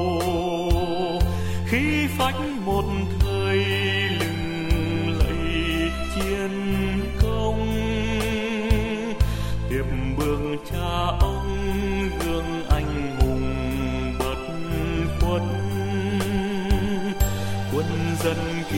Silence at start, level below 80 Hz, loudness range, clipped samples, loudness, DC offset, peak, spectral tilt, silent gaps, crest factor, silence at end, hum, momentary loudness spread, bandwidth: 0 s; -28 dBFS; 2 LU; under 0.1%; -24 LUFS; under 0.1%; -6 dBFS; -6 dB/octave; none; 16 dB; 0 s; none; 5 LU; 16.5 kHz